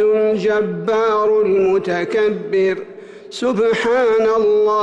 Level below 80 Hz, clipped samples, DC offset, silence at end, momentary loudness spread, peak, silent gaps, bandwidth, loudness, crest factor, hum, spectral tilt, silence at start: -56 dBFS; under 0.1%; under 0.1%; 0 s; 6 LU; -8 dBFS; none; 8.8 kHz; -16 LUFS; 8 dB; none; -6 dB/octave; 0 s